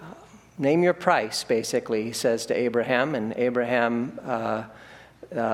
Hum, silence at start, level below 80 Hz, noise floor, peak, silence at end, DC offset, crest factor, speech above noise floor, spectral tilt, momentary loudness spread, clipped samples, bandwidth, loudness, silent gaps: none; 0 s; -64 dBFS; -47 dBFS; -4 dBFS; 0 s; under 0.1%; 22 dB; 22 dB; -4.5 dB/octave; 8 LU; under 0.1%; 16 kHz; -25 LUFS; none